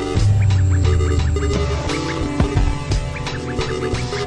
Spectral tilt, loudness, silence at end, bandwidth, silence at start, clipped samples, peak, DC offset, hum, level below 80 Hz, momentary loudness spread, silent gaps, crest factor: -6 dB/octave; -19 LUFS; 0 s; 10.5 kHz; 0 s; under 0.1%; -4 dBFS; under 0.1%; none; -24 dBFS; 7 LU; none; 14 dB